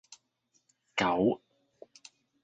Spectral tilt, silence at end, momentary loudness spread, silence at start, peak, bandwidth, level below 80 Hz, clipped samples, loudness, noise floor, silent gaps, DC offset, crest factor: -5 dB/octave; 1.1 s; 25 LU; 0.95 s; -14 dBFS; 9 kHz; -68 dBFS; under 0.1%; -30 LUFS; -75 dBFS; none; under 0.1%; 22 dB